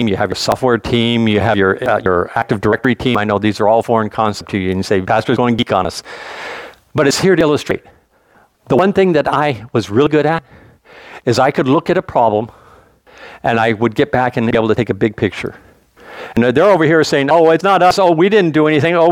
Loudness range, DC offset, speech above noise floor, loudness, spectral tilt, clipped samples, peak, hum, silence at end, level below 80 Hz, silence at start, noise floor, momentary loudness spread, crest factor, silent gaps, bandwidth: 4 LU; under 0.1%; 38 dB; -14 LUFS; -6 dB/octave; under 0.1%; 0 dBFS; none; 0 s; -46 dBFS; 0 s; -52 dBFS; 11 LU; 14 dB; none; 17 kHz